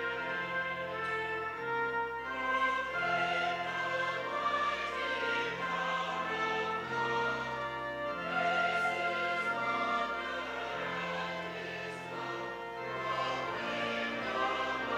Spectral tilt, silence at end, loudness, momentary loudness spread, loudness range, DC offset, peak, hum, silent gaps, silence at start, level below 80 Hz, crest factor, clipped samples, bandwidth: -4 dB/octave; 0 s; -34 LUFS; 7 LU; 4 LU; under 0.1%; -20 dBFS; none; none; 0 s; -66 dBFS; 14 dB; under 0.1%; 16 kHz